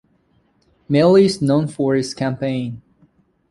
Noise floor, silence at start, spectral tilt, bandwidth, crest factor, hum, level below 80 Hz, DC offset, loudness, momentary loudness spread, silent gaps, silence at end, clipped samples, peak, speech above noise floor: -61 dBFS; 0.9 s; -6.5 dB/octave; 11.5 kHz; 16 dB; none; -54 dBFS; under 0.1%; -17 LUFS; 13 LU; none; 0.75 s; under 0.1%; -2 dBFS; 44 dB